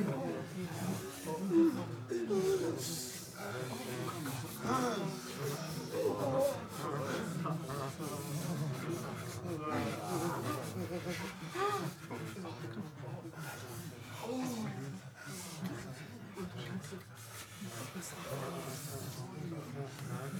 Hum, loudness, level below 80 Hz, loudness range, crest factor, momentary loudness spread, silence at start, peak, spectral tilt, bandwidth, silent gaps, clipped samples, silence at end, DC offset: none; -39 LUFS; -72 dBFS; 8 LU; 20 dB; 11 LU; 0 s; -20 dBFS; -5.5 dB/octave; over 20 kHz; none; under 0.1%; 0 s; under 0.1%